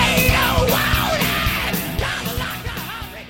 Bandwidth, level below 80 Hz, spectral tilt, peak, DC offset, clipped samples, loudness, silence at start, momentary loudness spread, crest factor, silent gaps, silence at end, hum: 17 kHz; -30 dBFS; -4 dB/octave; -2 dBFS; under 0.1%; under 0.1%; -19 LUFS; 0 s; 12 LU; 18 dB; none; 0 s; none